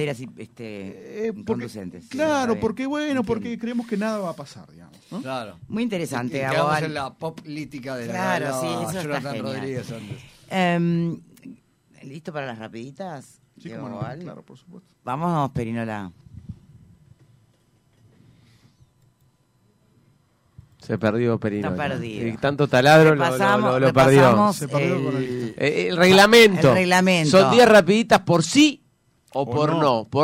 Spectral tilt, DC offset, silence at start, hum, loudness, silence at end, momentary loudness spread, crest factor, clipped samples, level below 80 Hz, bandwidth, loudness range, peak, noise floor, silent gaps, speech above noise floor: -5.5 dB/octave; under 0.1%; 0 s; none; -20 LUFS; 0 s; 22 LU; 18 dB; under 0.1%; -56 dBFS; 16 kHz; 15 LU; -4 dBFS; -63 dBFS; none; 42 dB